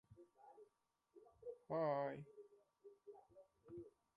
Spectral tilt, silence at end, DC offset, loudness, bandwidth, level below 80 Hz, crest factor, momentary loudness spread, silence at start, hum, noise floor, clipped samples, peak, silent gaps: -8.5 dB/octave; 0.25 s; under 0.1%; -47 LUFS; 10.5 kHz; -86 dBFS; 20 dB; 26 LU; 0.1 s; none; -84 dBFS; under 0.1%; -30 dBFS; none